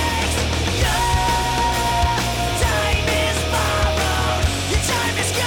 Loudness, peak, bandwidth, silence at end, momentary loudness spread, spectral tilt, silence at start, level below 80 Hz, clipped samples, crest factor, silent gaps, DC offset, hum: -19 LUFS; -10 dBFS; 18 kHz; 0 s; 2 LU; -3.5 dB/octave; 0 s; -26 dBFS; under 0.1%; 10 dB; none; under 0.1%; none